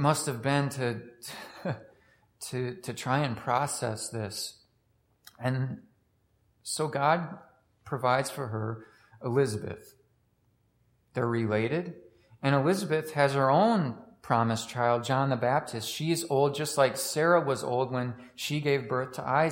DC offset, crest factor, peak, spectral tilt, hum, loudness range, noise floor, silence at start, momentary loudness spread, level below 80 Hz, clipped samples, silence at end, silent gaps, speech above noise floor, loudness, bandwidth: under 0.1%; 20 dB; -10 dBFS; -5 dB/octave; none; 6 LU; -70 dBFS; 0 s; 13 LU; -70 dBFS; under 0.1%; 0 s; none; 42 dB; -29 LUFS; 16.5 kHz